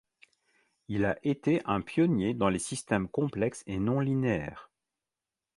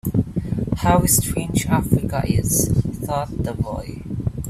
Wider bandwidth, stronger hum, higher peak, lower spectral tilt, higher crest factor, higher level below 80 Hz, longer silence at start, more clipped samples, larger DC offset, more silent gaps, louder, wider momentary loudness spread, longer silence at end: second, 11.5 kHz vs 16 kHz; neither; second, -10 dBFS vs -2 dBFS; about the same, -6.5 dB/octave vs -5.5 dB/octave; about the same, 20 dB vs 18 dB; second, -56 dBFS vs -34 dBFS; first, 0.9 s vs 0.05 s; neither; neither; neither; second, -30 LUFS vs -21 LUFS; second, 6 LU vs 10 LU; first, 0.9 s vs 0 s